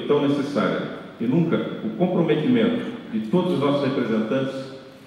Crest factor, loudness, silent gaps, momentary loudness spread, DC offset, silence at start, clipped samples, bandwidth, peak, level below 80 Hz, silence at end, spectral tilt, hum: 16 dB; -23 LUFS; none; 9 LU; under 0.1%; 0 s; under 0.1%; 11 kHz; -6 dBFS; -66 dBFS; 0 s; -8 dB/octave; none